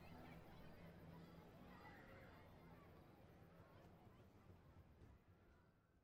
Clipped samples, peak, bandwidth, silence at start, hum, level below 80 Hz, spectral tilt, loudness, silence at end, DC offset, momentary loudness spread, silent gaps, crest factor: under 0.1%; -50 dBFS; 15.5 kHz; 0 s; none; -74 dBFS; -7 dB/octave; -65 LUFS; 0 s; under 0.1%; 6 LU; none; 16 dB